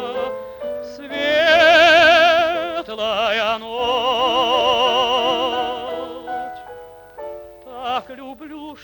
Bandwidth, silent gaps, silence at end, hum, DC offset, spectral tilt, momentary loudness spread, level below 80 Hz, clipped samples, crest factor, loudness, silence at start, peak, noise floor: 19 kHz; none; 0.1 s; none; under 0.1%; -2.5 dB/octave; 24 LU; -52 dBFS; under 0.1%; 16 dB; -16 LUFS; 0 s; -2 dBFS; -39 dBFS